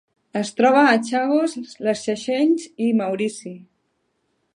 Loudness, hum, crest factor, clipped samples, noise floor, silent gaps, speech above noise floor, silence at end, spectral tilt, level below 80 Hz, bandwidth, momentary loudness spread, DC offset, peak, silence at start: -20 LUFS; none; 18 dB; under 0.1%; -70 dBFS; none; 51 dB; 1 s; -4.5 dB/octave; -72 dBFS; 11 kHz; 12 LU; under 0.1%; -4 dBFS; 0.35 s